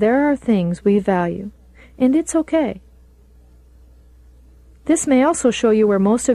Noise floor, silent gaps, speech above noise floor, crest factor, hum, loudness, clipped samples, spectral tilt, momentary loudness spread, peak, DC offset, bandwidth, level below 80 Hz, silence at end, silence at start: -48 dBFS; none; 32 dB; 14 dB; none; -17 LUFS; under 0.1%; -5.5 dB/octave; 10 LU; -4 dBFS; under 0.1%; 12.5 kHz; -46 dBFS; 0 s; 0 s